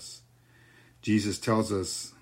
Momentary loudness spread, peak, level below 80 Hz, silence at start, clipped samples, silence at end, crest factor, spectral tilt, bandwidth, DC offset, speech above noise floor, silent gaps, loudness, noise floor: 16 LU; -14 dBFS; -62 dBFS; 0 s; under 0.1%; 0.1 s; 18 dB; -5 dB/octave; 16 kHz; under 0.1%; 31 dB; none; -29 LUFS; -59 dBFS